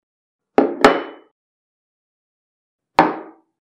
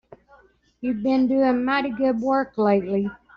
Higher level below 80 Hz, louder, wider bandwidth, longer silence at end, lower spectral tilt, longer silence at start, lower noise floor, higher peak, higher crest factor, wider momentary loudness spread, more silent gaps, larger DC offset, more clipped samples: about the same, -54 dBFS vs -58 dBFS; first, -17 LUFS vs -22 LUFS; first, 14.5 kHz vs 6.2 kHz; first, 0.4 s vs 0.2 s; about the same, -5 dB/octave vs -5 dB/octave; second, 0.6 s vs 0.8 s; first, under -90 dBFS vs -56 dBFS; first, 0 dBFS vs -8 dBFS; first, 22 dB vs 14 dB; first, 15 LU vs 6 LU; first, 1.31-2.79 s vs none; neither; neither